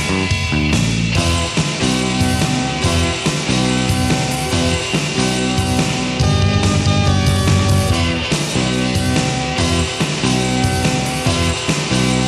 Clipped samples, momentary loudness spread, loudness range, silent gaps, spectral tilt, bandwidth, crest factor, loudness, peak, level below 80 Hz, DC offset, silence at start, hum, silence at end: under 0.1%; 3 LU; 1 LU; none; -4.5 dB/octave; 13.5 kHz; 14 dB; -16 LUFS; -2 dBFS; -30 dBFS; under 0.1%; 0 s; none; 0 s